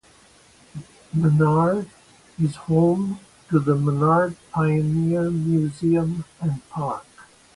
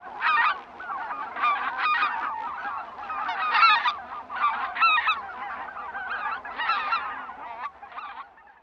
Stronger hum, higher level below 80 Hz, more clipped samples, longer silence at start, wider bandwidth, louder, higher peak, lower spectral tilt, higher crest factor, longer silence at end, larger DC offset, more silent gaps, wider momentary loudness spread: neither; first, -54 dBFS vs -66 dBFS; neither; first, 0.75 s vs 0 s; first, 11.5 kHz vs 7 kHz; first, -22 LUFS vs -25 LUFS; about the same, -6 dBFS vs -8 dBFS; first, -9 dB/octave vs -2 dB/octave; about the same, 16 dB vs 20 dB; first, 0.35 s vs 0.2 s; neither; neither; second, 14 LU vs 17 LU